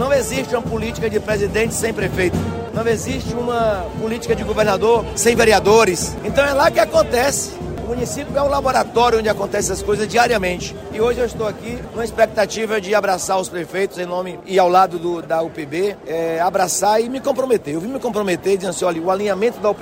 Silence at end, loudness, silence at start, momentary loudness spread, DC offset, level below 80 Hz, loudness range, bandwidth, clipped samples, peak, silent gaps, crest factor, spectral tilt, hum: 0 s; -18 LUFS; 0 s; 10 LU; under 0.1%; -38 dBFS; 5 LU; 16 kHz; under 0.1%; -2 dBFS; none; 16 dB; -4 dB/octave; none